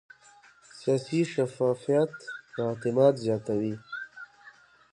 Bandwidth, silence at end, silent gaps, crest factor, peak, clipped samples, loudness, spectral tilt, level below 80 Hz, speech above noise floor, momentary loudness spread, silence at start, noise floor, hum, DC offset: 11 kHz; 0.4 s; none; 20 dB; -10 dBFS; under 0.1%; -28 LUFS; -7 dB/octave; -70 dBFS; 30 dB; 17 LU; 0.75 s; -57 dBFS; none; under 0.1%